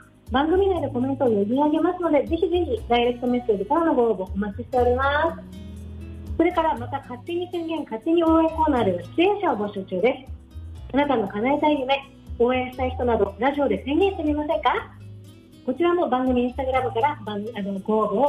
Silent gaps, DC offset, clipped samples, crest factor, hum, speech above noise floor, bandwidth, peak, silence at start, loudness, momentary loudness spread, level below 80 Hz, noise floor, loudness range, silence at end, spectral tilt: none; under 0.1%; under 0.1%; 14 dB; none; 23 dB; 12.5 kHz; -10 dBFS; 0.25 s; -23 LUFS; 12 LU; -42 dBFS; -45 dBFS; 3 LU; 0 s; -7.5 dB/octave